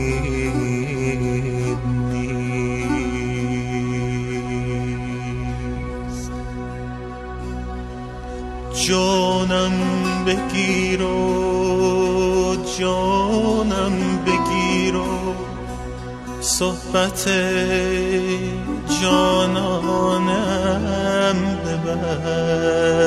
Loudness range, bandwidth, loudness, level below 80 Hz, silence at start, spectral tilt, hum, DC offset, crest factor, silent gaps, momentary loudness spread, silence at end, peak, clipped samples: 7 LU; 14 kHz; -21 LUFS; -34 dBFS; 0 s; -5 dB/octave; none; under 0.1%; 18 dB; none; 12 LU; 0 s; -2 dBFS; under 0.1%